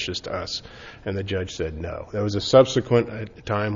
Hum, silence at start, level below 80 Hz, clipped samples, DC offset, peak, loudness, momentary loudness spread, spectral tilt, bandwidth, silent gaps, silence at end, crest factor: none; 0 s; -48 dBFS; under 0.1%; under 0.1%; -2 dBFS; -24 LUFS; 16 LU; -5.5 dB/octave; 7.6 kHz; none; 0 s; 20 dB